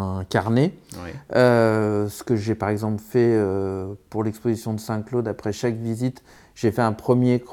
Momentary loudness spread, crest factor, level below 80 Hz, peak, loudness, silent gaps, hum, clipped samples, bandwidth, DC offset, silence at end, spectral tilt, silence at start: 9 LU; 20 dB; -58 dBFS; -2 dBFS; -23 LUFS; none; none; under 0.1%; 17.5 kHz; under 0.1%; 0 s; -7 dB/octave; 0 s